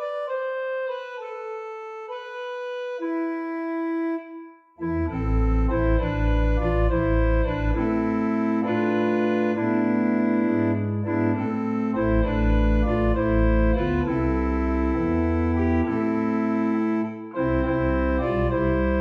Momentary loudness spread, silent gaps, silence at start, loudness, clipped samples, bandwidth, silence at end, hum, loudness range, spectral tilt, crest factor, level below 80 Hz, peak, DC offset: 10 LU; none; 0 s; -24 LUFS; under 0.1%; 5.6 kHz; 0 s; none; 7 LU; -9.5 dB/octave; 14 dB; -28 dBFS; -10 dBFS; under 0.1%